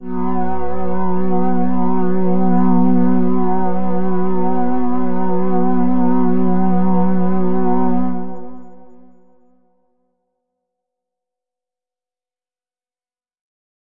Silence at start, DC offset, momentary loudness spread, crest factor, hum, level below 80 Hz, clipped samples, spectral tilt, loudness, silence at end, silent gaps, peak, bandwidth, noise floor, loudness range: 0 s; under 0.1%; 8 LU; 12 dB; none; -42 dBFS; under 0.1%; -12.5 dB/octave; -18 LUFS; 0.5 s; none; -4 dBFS; 3.4 kHz; under -90 dBFS; 6 LU